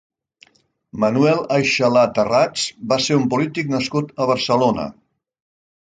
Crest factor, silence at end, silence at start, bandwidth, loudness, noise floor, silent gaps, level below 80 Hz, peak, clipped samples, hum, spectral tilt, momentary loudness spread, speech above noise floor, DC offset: 16 dB; 0.95 s; 0.95 s; 9.4 kHz; -18 LUFS; -54 dBFS; none; -56 dBFS; -2 dBFS; under 0.1%; none; -5 dB/octave; 7 LU; 36 dB; under 0.1%